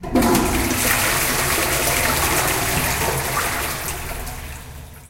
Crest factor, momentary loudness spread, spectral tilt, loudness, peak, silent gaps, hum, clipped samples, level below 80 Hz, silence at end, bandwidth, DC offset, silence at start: 18 dB; 14 LU; -3 dB/octave; -19 LUFS; -4 dBFS; none; none; under 0.1%; -32 dBFS; 0 s; 17 kHz; under 0.1%; 0 s